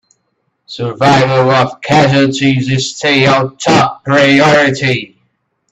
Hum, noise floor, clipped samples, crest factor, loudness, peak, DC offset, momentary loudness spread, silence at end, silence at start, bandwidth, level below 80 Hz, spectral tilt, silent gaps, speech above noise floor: none; -65 dBFS; under 0.1%; 12 dB; -10 LUFS; 0 dBFS; under 0.1%; 7 LU; 0.65 s; 0.7 s; 8.8 kHz; -48 dBFS; -5 dB/octave; none; 55 dB